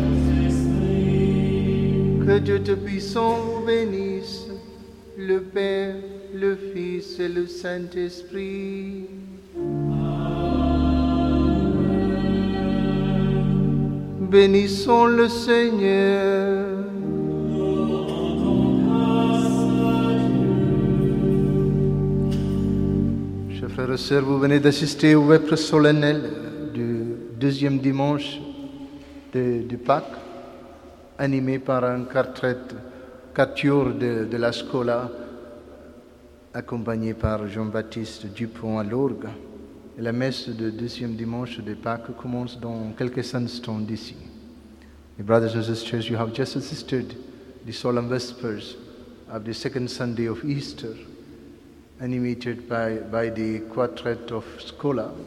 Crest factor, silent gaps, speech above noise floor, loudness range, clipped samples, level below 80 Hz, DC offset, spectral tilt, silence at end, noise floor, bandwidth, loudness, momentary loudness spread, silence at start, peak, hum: 20 dB; none; 26 dB; 11 LU; under 0.1%; -38 dBFS; under 0.1%; -7 dB/octave; 0 s; -49 dBFS; 12.5 kHz; -23 LUFS; 16 LU; 0 s; -4 dBFS; none